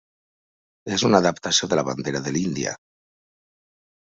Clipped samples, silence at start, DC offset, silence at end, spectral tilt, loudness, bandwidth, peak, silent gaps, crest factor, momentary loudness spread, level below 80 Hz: under 0.1%; 0.85 s; under 0.1%; 1.4 s; -3.5 dB/octave; -22 LUFS; 8 kHz; -4 dBFS; none; 22 dB; 11 LU; -60 dBFS